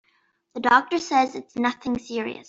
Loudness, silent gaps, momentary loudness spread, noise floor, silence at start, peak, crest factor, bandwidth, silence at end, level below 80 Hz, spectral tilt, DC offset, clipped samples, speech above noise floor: -23 LUFS; none; 10 LU; -67 dBFS; 0.55 s; -4 dBFS; 20 dB; 7.8 kHz; 0.05 s; -60 dBFS; -3.5 dB/octave; under 0.1%; under 0.1%; 44 dB